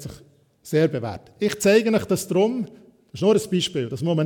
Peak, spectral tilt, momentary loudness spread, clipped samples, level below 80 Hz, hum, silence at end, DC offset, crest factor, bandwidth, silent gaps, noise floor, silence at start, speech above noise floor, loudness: -6 dBFS; -5.5 dB/octave; 14 LU; under 0.1%; -58 dBFS; none; 0 s; under 0.1%; 16 dB; 19 kHz; none; -53 dBFS; 0 s; 32 dB; -22 LUFS